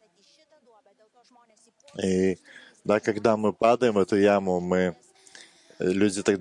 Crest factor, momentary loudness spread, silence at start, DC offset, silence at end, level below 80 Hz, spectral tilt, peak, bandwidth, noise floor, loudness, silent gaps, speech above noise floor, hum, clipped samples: 18 dB; 9 LU; 1.95 s; under 0.1%; 0 s; -68 dBFS; -6 dB/octave; -8 dBFS; 11 kHz; -62 dBFS; -24 LUFS; none; 37 dB; none; under 0.1%